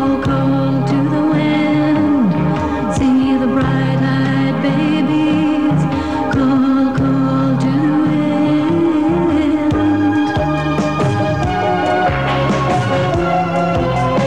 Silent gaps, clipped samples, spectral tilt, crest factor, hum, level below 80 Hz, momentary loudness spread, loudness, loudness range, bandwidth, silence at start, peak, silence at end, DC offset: none; under 0.1%; -7.5 dB/octave; 10 dB; none; -36 dBFS; 3 LU; -15 LUFS; 1 LU; 9.6 kHz; 0 s; -4 dBFS; 0 s; 1%